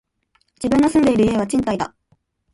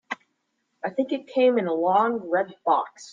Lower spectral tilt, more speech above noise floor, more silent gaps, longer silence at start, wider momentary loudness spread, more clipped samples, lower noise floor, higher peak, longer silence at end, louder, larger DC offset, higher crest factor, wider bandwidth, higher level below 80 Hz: about the same, -6 dB/octave vs -5.5 dB/octave; about the same, 48 dB vs 51 dB; neither; first, 0.6 s vs 0.1 s; about the same, 11 LU vs 12 LU; neither; second, -65 dBFS vs -75 dBFS; first, -4 dBFS vs -8 dBFS; first, 0.65 s vs 0 s; first, -18 LUFS vs -24 LUFS; neither; about the same, 14 dB vs 18 dB; first, 11.5 kHz vs 7.6 kHz; first, -44 dBFS vs -78 dBFS